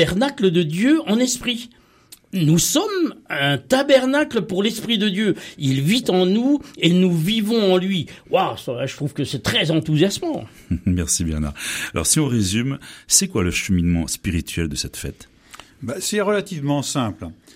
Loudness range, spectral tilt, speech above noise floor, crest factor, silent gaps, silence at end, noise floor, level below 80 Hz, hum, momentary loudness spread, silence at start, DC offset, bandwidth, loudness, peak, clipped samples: 3 LU; -4.5 dB/octave; 29 dB; 20 dB; none; 0.2 s; -49 dBFS; -42 dBFS; none; 10 LU; 0 s; under 0.1%; 16 kHz; -20 LUFS; 0 dBFS; under 0.1%